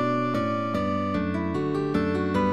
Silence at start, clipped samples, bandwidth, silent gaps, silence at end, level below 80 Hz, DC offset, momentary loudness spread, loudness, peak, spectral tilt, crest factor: 0 s; under 0.1%; 11.5 kHz; none; 0 s; -52 dBFS; 0.5%; 2 LU; -26 LUFS; -12 dBFS; -8 dB/octave; 12 dB